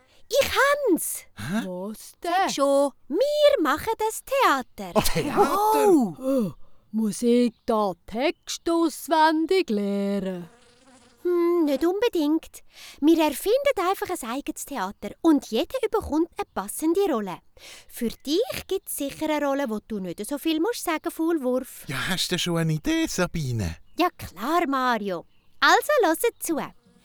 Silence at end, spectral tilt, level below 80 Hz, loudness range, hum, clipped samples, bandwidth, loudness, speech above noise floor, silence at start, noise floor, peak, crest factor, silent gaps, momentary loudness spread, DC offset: 0.35 s; -4.5 dB/octave; -48 dBFS; 4 LU; none; under 0.1%; over 20 kHz; -24 LUFS; 31 dB; 0.2 s; -55 dBFS; -6 dBFS; 18 dB; none; 12 LU; under 0.1%